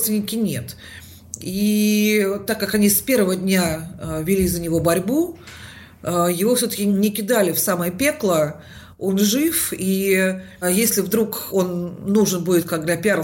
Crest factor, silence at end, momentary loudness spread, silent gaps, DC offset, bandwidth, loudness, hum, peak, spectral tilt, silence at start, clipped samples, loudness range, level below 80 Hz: 14 dB; 0 s; 12 LU; none; under 0.1%; 16.5 kHz; -19 LUFS; none; -6 dBFS; -4.5 dB/octave; 0 s; under 0.1%; 2 LU; -48 dBFS